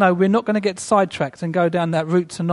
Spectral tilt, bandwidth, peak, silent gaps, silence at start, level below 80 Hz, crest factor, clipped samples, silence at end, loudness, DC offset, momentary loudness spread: -6 dB/octave; 11.5 kHz; -2 dBFS; none; 0 s; -58 dBFS; 18 dB; under 0.1%; 0 s; -19 LUFS; under 0.1%; 5 LU